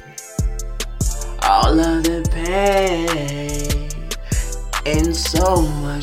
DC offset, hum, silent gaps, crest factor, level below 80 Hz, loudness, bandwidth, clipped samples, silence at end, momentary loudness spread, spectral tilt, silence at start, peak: under 0.1%; none; none; 16 dB; -24 dBFS; -19 LUFS; 16.5 kHz; under 0.1%; 0 s; 10 LU; -4.5 dB/octave; 0 s; -2 dBFS